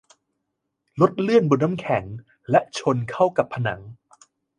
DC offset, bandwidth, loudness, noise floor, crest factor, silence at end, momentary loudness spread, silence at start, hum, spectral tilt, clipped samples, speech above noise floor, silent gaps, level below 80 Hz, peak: under 0.1%; 10.5 kHz; -22 LUFS; -78 dBFS; 20 dB; 0.65 s; 18 LU; 0.95 s; none; -7 dB/octave; under 0.1%; 57 dB; none; -58 dBFS; -4 dBFS